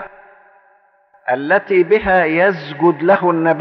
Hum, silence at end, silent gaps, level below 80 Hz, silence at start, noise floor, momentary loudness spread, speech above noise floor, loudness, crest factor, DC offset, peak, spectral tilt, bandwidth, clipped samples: none; 0 s; none; -48 dBFS; 0 s; -54 dBFS; 8 LU; 40 dB; -15 LUFS; 14 dB; under 0.1%; -2 dBFS; -4.5 dB/octave; 5.8 kHz; under 0.1%